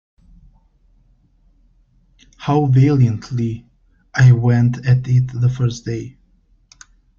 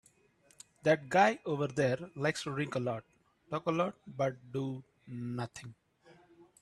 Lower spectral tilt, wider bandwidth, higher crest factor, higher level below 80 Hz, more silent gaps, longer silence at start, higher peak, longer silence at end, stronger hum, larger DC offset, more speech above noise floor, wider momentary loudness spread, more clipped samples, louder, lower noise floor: first, -8 dB/octave vs -6 dB/octave; second, 7 kHz vs 12.5 kHz; about the same, 16 dB vs 20 dB; first, -46 dBFS vs -72 dBFS; neither; first, 2.4 s vs 0.85 s; first, -2 dBFS vs -14 dBFS; first, 1.1 s vs 0.2 s; neither; neither; first, 41 dB vs 34 dB; about the same, 15 LU vs 15 LU; neither; first, -16 LUFS vs -34 LUFS; second, -55 dBFS vs -68 dBFS